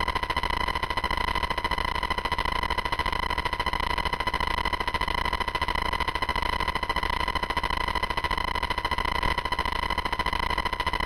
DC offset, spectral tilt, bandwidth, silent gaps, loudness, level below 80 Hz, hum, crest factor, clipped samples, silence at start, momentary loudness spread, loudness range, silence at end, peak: under 0.1%; -4 dB/octave; 17 kHz; none; -27 LUFS; -36 dBFS; none; 18 dB; under 0.1%; 0 s; 1 LU; 0 LU; 0 s; -10 dBFS